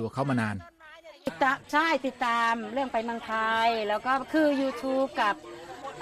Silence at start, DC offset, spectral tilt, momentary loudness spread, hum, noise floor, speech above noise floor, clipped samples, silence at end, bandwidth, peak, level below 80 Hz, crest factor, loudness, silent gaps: 0 s; under 0.1%; -5 dB/octave; 12 LU; none; -50 dBFS; 23 dB; under 0.1%; 0 s; 14.5 kHz; -12 dBFS; -64 dBFS; 16 dB; -27 LUFS; none